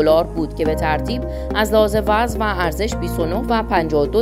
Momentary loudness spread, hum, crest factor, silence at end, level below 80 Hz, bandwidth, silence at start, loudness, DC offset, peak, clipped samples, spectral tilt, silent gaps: 7 LU; none; 16 dB; 0 s; -28 dBFS; 16 kHz; 0 s; -19 LUFS; under 0.1%; -2 dBFS; under 0.1%; -6 dB/octave; none